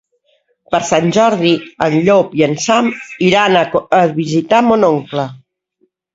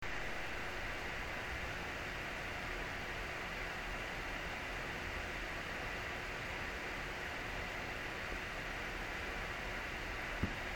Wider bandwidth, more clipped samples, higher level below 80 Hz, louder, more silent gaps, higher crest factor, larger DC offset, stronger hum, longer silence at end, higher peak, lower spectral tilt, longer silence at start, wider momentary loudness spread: second, 7.8 kHz vs 17.5 kHz; neither; about the same, -52 dBFS vs -50 dBFS; first, -13 LUFS vs -42 LUFS; neither; second, 14 dB vs 20 dB; neither; neither; first, 0.8 s vs 0 s; first, 0 dBFS vs -22 dBFS; about the same, -5 dB/octave vs -4 dB/octave; first, 0.7 s vs 0 s; first, 7 LU vs 0 LU